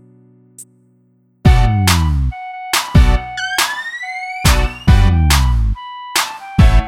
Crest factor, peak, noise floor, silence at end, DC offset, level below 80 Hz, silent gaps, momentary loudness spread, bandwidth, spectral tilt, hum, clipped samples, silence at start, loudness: 14 dB; 0 dBFS; -55 dBFS; 0 s; under 0.1%; -16 dBFS; none; 10 LU; 17 kHz; -4.5 dB/octave; none; under 0.1%; 0.6 s; -15 LUFS